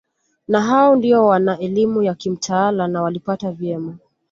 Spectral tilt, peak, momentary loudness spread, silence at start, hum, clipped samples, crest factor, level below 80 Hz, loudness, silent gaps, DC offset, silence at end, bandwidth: -6 dB/octave; -2 dBFS; 11 LU; 0.5 s; none; under 0.1%; 14 dB; -60 dBFS; -17 LUFS; none; under 0.1%; 0.35 s; 7.8 kHz